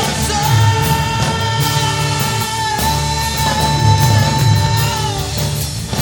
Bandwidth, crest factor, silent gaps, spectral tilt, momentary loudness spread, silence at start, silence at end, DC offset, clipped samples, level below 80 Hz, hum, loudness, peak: 18 kHz; 14 dB; none; -4 dB/octave; 6 LU; 0 s; 0 s; under 0.1%; under 0.1%; -28 dBFS; none; -15 LUFS; 0 dBFS